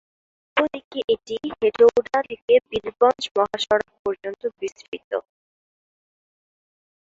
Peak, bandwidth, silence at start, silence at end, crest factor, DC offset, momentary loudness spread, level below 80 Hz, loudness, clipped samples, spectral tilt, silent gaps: -4 dBFS; 7.8 kHz; 0.55 s; 2 s; 20 dB; under 0.1%; 13 LU; -60 dBFS; -22 LUFS; under 0.1%; -3.5 dB/octave; 0.84-0.91 s, 1.04-1.08 s, 2.42-2.48 s, 3.31-3.35 s, 3.99-4.05 s, 4.88-4.92 s, 5.04-5.11 s